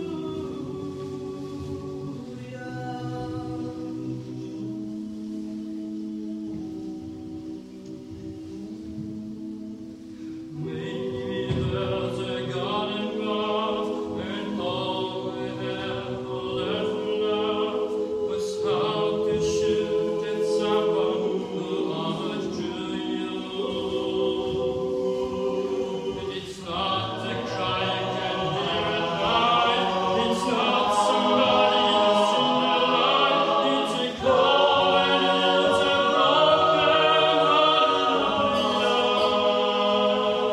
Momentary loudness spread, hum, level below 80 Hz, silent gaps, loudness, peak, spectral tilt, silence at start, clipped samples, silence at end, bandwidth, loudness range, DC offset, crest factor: 16 LU; none; -56 dBFS; none; -24 LUFS; -8 dBFS; -5 dB/octave; 0 s; under 0.1%; 0 s; 12.5 kHz; 14 LU; under 0.1%; 18 dB